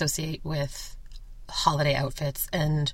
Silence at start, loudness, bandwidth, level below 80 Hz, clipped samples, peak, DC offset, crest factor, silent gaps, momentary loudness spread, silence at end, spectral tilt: 0 s; -28 LUFS; 16.5 kHz; -42 dBFS; under 0.1%; -6 dBFS; under 0.1%; 22 dB; none; 10 LU; 0 s; -4.5 dB/octave